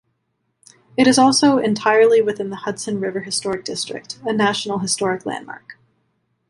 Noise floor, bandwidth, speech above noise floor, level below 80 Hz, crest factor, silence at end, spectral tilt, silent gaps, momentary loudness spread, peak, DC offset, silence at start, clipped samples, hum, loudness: -71 dBFS; 11.5 kHz; 53 dB; -62 dBFS; 18 dB; 0.75 s; -3.5 dB/octave; none; 15 LU; 0 dBFS; under 0.1%; 1 s; under 0.1%; none; -18 LUFS